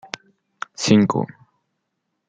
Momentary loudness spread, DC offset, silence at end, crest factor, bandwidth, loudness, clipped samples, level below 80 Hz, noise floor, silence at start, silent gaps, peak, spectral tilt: 20 LU; under 0.1%; 1.05 s; 22 dB; 9.2 kHz; -18 LUFS; under 0.1%; -60 dBFS; -76 dBFS; 0.8 s; none; -2 dBFS; -5.5 dB/octave